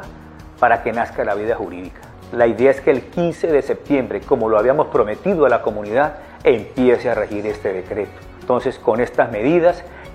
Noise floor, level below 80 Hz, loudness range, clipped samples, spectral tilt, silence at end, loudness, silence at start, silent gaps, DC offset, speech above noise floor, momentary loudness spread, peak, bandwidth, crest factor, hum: -38 dBFS; -44 dBFS; 2 LU; under 0.1%; -7 dB/octave; 0 s; -18 LUFS; 0 s; none; under 0.1%; 21 dB; 10 LU; 0 dBFS; 11.5 kHz; 18 dB; none